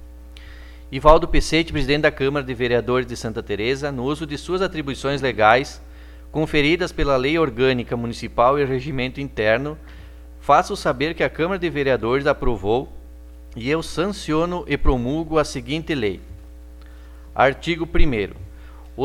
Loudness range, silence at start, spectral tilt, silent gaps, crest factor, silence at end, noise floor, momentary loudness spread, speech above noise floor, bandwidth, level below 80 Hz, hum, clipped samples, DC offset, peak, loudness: 4 LU; 0 s; -5.5 dB/octave; none; 20 dB; 0 s; -40 dBFS; 15 LU; 20 dB; 13 kHz; -30 dBFS; none; under 0.1%; under 0.1%; 0 dBFS; -21 LUFS